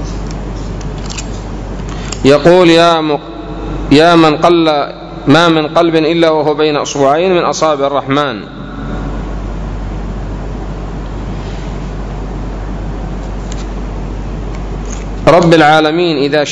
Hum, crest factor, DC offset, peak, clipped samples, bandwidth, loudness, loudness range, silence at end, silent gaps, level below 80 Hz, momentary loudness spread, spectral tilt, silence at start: none; 12 dB; under 0.1%; 0 dBFS; 1%; 11 kHz; -12 LUFS; 13 LU; 0 s; none; -24 dBFS; 16 LU; -5.5 dB/octave; 0 s